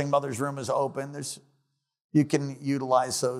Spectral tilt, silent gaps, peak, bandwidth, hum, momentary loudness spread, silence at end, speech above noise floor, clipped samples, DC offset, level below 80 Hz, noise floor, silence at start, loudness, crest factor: -5.5 dB/octave; 2.04-2.09 s; -10 dBFS; 15.5 kHz; none; 11 LU; 0 s; 49 dB; under 0.1%; under 0.1%; -76 dBFS; -76 dBFS; 0 s; -28 LUFS; 18 dB